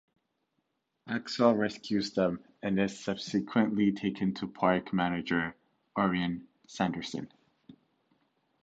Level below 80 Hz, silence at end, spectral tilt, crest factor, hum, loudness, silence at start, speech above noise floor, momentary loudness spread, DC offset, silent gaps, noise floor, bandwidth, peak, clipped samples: -64 dBFS; 0.9 s; -6 dB/octave; 22 dB; none; -31 LUFS; 1.05 s; 50 dB; 11 LU; under 0.1%; none; -80 dBFS; 8 kHz; -10 dBFS; under 0.1%